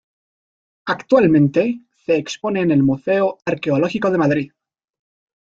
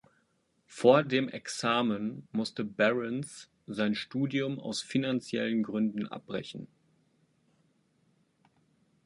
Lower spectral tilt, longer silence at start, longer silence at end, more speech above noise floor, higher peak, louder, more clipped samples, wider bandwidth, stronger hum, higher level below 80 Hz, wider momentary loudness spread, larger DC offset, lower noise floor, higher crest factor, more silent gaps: first, -7 dB/octave vs -5 dB/octave; first, 0.85 s vs 0.7 s; second, 1 s vs 2.4 s; first, over 73 dB vs 43 dB; first, -2 dBFS vs -8 dBFS; first, -18 LUFS vs -31 LUFS; neither; second, 7.6 kHz vs 11.5 kHz; neither; first, -56 dBFS vs -74 dBFS; about the same, 11 LU vs 13 LU; neither; first, under -90 dBFS vs -73 dBFS; second, 16 dB vs 24 dB; neither